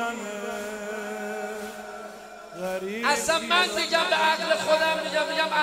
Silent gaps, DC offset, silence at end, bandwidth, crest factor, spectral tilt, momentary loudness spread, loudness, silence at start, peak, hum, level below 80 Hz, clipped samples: none; under 0.1%; 0 s; 16 kHz; 18 dB; -2 dB/octave; 16 LU; -25 LUFS; 0 s; -8 dBFS; none; -64 dBFS; under 0.1%